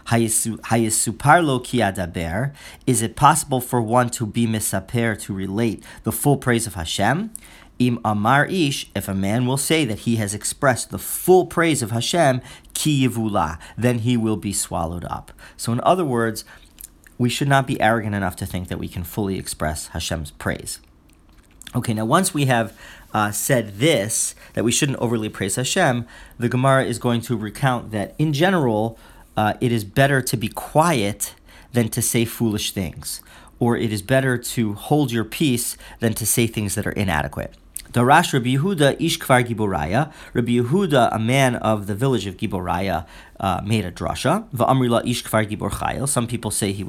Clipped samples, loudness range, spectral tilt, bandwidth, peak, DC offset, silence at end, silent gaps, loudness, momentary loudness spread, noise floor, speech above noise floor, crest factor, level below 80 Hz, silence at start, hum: under 0.1%; 4 LU; -4.5 dB/octave; 17 kHz; 0 dBFS; under 0.1%; 0 s; none; -21 LUFS; 10 LU; -51 dBFS; 31 dB; 20 dB; -44 dBFS; 0.05 s; none